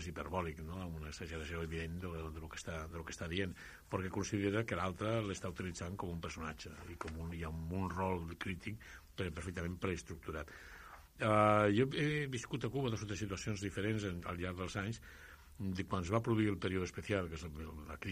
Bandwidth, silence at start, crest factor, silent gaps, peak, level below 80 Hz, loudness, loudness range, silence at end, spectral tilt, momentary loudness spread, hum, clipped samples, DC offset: 15.5 kHz; 0 s; 24 dB; none; -16 dBFS; -56 dBFS; -40 LUFS; 8 LU; 0 s; -6 dB/octave; 13 LU; none; under 0.1%; under 0.1%